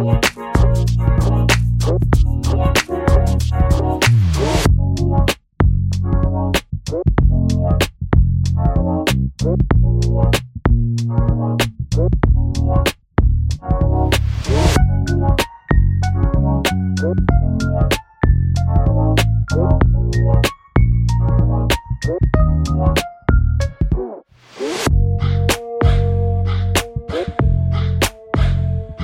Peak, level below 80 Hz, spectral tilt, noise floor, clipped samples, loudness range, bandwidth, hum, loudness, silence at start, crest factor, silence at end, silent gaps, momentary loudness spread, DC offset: 0 dBFS; -20 dBFS; -6 dB/octave; -37 dBFS; under 0.1%; 2 LU; 16.5 kHz; none; -17 LUFS; 0 s; 14 dB; 0 s; none; 4 LU; under 0.1%